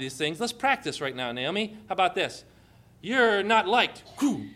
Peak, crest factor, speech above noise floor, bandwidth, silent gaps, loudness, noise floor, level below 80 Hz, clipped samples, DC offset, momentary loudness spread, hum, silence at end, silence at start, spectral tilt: -8 dBFS; 20 dB; 29 dB; 15.5 kHz; none; -26 LUFS; -56 dBFS; -64 dBFS; under 0.1%; under 0.1%; 10 LU; none; 0 s; 0 s; -3.5 dB/octave